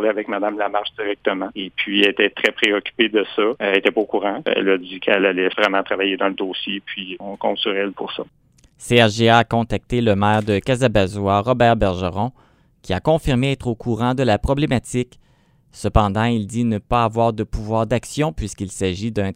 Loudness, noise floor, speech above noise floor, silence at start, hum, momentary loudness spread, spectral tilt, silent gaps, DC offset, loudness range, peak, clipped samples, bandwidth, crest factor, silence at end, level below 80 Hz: -19 LUFS; -56 dBFS; 37 dB; 0 s; none; 10 LU; -5.5 dB/octave; none; under 0.1%; 3 LU; 0 dBFS; under 0.1%; 15.5 kHz; 20 dB; 0 s; -38 dBFS